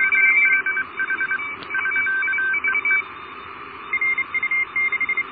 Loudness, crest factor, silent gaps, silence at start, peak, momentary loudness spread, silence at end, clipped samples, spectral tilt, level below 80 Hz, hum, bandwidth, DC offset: -19 LUFS; 16 dB; none; 0 s; -6 dBFS; 19 LU; 0 s; under 0.1%; -6.5 dB/octave; -62 dBFS; none; 4.9 kHz; under 0.1%